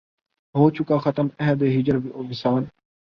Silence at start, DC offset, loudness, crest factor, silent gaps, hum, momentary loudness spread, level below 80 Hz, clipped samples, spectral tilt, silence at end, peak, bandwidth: 0.55 s; under 0.1%; -22 LUFS; 20 dB; none; none; 8 LU; -58 dBFS; under 0.1%; -9.5 dB/octave; 0.4 s; -4 dBFS; 6.2 kHz